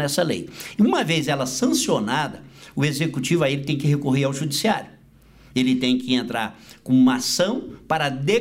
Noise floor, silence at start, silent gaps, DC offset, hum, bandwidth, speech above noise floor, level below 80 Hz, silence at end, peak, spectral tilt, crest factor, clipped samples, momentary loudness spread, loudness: -51 dBFS; 0 s; none; under 0.1%; none; 16 kHz; 29 dB; -56 dBFS; 0 s; -8 dBFS; -4.5 dB/octave; 14 dB; under 0.1%; 10 LU; -22 LUFS